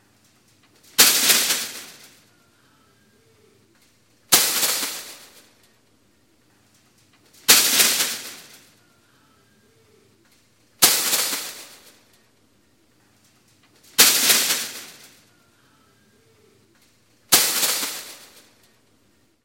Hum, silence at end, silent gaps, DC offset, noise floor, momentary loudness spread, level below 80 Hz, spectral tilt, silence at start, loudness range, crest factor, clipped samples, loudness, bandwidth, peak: none; 1.3 s; none; under 0.1%; -62 dBFS; 24 LU; -68 dBFS; 1.5 dB/octave; 1 s; 4 LU; 24 dB; under 0.1%; -17 LUFS; 17 kHz; 0 dBFS